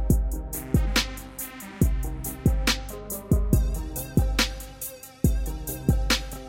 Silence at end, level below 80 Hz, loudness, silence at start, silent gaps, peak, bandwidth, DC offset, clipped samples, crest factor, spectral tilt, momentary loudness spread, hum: 0 s; -28 dBFS; -27 LUFS; 0 s; none; -6 dBFS; 17 kHz; under 0.1%; under 0.1%; 20 dB; -4.5 dB/octave; 12 LU; none